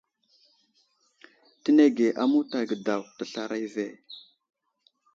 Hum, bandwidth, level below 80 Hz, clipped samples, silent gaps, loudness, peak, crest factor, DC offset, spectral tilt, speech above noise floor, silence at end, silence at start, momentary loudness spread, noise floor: none; 7.6 kHz; -82 dBFS; under 0.1%; none; -26 LUFS; -8 dBFS; 20 dB; under 0.1%; -5.5 dB/octave; 45 dB; 0.95 s; 1.65 s; 18 LU; -70 dBFS